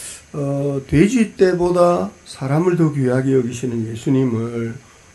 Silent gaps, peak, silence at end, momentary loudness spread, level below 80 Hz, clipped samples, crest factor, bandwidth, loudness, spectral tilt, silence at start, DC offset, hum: none; 0 dBFS; 0.35 s; 12 LU; -44 dBFS; under 0.1%; 18 dB; 12 kHz; -18 LUFS; -7 dB/octave; 0 s; under 0.1%; none